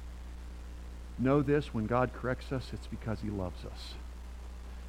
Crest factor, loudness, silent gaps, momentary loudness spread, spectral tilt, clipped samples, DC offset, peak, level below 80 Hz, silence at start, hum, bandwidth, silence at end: 20 dB; -34 LUFS; none; 18 LU; -7.5 dB/octave; under 0.1%; under 0.1%; -14 dBFS; -44 dBFS; 0 s; 60 Hz at -45 dBFS; 15.5 kHz; 0 s